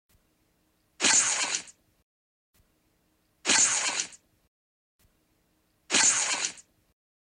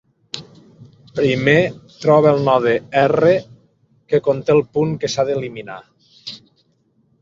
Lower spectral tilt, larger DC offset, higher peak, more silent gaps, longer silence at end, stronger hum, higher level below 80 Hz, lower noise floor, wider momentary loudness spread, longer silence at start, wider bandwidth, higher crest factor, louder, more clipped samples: second, 1.5 dB/octave vs -6 dB/octave; neither; second, -10 dBFS vs -2 dBFS; first, 2.03-2.54 s, 4.48-4.99 s vs none; about the same, 0.8 s vs 0.85 s; neither; second, -76 dBFS vs -56 dBFS; first, -71 dBFS vs -61 dBFS; second, 12 LU vs 20 LU; first, 1 s vs 0.35 s; first, 16 kHz vs 7.6 kHz; about the same, 20 dB vs 16 dB; second, -24 LUFS vs -16 LUFS; neither